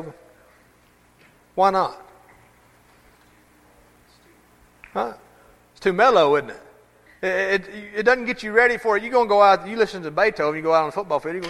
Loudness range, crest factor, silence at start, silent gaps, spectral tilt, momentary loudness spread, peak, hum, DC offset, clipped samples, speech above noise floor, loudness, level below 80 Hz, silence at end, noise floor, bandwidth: 17 LU; 20 dB; 0 s; none; -5 dB/octave; 13 LU; -2 dBFS; 60 Hz at -60 dBFS; under 0.1%; under 0.1%; 37 dB; -20 LUFS; -58 dBFS; 0 s; -56 dBFS; 13.5 kHz